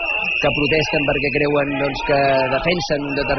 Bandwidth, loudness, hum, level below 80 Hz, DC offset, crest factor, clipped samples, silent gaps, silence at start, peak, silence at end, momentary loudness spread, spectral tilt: 6.4 kHz; -18 LUFS; none; -38 dBFS; under 0.1%; 12 dB; under 0.1%; none; 0 s; -6 dBFS; 0 s; 4 LU; -3 dB/octave